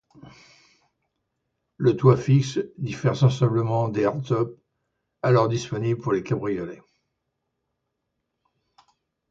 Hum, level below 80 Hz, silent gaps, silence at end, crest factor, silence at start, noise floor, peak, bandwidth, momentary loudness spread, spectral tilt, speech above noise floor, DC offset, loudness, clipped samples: none; -58 dBFS; none; 2.55 s; 22 dB; 0.25 s; -79 dBFS; -4 dBFS; 7.6 kHz; 10 LU; -7.5 dB/octave; 57 dB; under 0.1%; -23 LUFS; under 0.1%